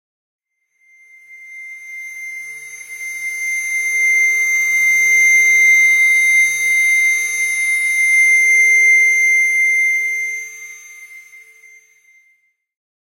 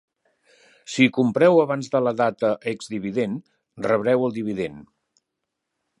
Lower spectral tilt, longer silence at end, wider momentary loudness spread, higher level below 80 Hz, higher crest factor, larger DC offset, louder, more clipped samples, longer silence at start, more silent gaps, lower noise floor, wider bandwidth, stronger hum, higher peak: second, 3 dB/octave vs -6 dB/octave; first, 1.7 s vs 1.15 s; first, 21 LU vs 13 LU; second, -78 dBFS vs -64 dBFS; second, 12 dB vs 20 dB; neither; first, -11 LUFS vs -22 LUFS; neither; first, 1.3 s vs 0.9 s; neither; second, -60 dBFS vs -81 dBFS; first, 16 kHz vs 11 kHz; neither; about the same, -4 dBFS vs -2 dBFS